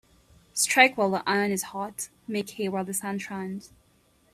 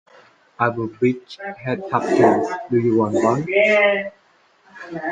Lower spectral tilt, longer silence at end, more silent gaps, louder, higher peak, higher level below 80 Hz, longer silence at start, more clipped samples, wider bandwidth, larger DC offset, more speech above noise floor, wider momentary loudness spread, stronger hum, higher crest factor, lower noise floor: second, -3 dB/octave vs -6.5 dB/octave; first, 0.65 s vs 0 s; neither; second, -26 LUFS vs -19 LUFS; about the same, -4 dBFS vs -2 dBFS; second, -68 dBFS vs -62 dBFS; about the same, 0.55 s vs 0.6 s; neither; first, 15.5 kHz vs 9.2 kHz; neither; about the same, 37 dB vs 37 dB; about the same, 16 LU vs 14 LU; neither; first, 24 dB vs 18 dB; first, -64 dBFS vs -56 dBFS